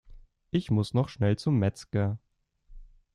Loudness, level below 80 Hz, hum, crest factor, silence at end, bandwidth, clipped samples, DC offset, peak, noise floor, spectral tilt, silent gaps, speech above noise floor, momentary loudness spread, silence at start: -29 LUFS; -54 dBFS; none; 18 dB; 0.3 s; 11 kHz; under 0.1%; under 0.1%; -12 dBFS; -57 dBFS; -8 dB/octave; none; 31 dB; 6 LU; 0.1 s